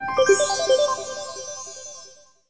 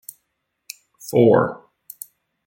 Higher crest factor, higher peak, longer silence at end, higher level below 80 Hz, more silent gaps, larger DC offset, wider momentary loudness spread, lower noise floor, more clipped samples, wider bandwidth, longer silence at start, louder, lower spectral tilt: about the same, 18 dB vs 20 dB; second, -6 dBFS vs -2 dBFS; second, 0.35 s vs 0.9 s; about the same, -60 dBFS vs -64 dBFS; neither; neither; second, 19 LU vs 25 LU; second, -48 dBFS vs -75 dBFS; neither; second, 8 kHz vs 17 kHz; second, 0 s vs 1.05 s; second, -21 LUFS vs -17 LUFS; second, -1 dB/octave vs -6.5 dB/octave